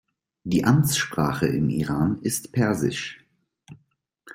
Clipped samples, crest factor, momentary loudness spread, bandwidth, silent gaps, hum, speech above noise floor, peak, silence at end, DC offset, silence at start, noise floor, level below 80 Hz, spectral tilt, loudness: under 0.1%; 18 dB; 8 LU; 16.5 kHz; none; none; 44 dB; -6 dBFS; 0 s; under 0.1%; 0.45 s; -67 dBFS; -52 dBFS; -5 dB/octave; -23 LUFS